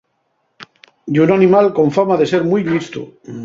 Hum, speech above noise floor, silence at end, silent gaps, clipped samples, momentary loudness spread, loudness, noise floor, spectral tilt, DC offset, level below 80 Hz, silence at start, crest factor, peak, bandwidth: none; 52 dB; 0 s; none; under 0.1%; 18 LU; -14 LUFS; -66 dBFS; -7.5 dB/octave; under 0.1%; -56 dBFS; 0.6 s; 14 dB; 0 dBFS; 7.6 kHz